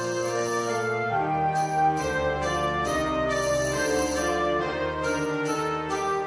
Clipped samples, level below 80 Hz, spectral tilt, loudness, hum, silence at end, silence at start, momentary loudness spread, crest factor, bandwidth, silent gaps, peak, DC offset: under 0.1%; -46 dBFS; -4.5 dB/octave; -26 LUFS; none; 0 s; 0 s; 3 LU; 12 dB; 11 kHz; none; -14 dBFS; under 0.1%